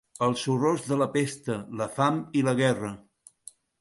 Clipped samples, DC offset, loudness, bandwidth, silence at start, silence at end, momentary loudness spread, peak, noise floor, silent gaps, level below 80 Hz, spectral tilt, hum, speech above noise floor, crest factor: under 0.1%; under 0.1%; -27 LUFS; 11.5 kHz; 0.2 s; 0.8 s; 12 LU; -10 dBFS; -52 dBFS; none; -66 dBFS; -5.5 dB/octave; none; 26 dB; 18 dB